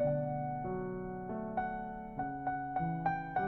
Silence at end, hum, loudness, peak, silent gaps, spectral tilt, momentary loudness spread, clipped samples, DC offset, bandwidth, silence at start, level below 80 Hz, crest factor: 0 s; none; -38 LUFS; -22 dBFS; none; -8 dB/octave; 6 LU; under 0.1%; under 0.1%; 4.2 kHz; 0 s; -56 dBFS; 16 dB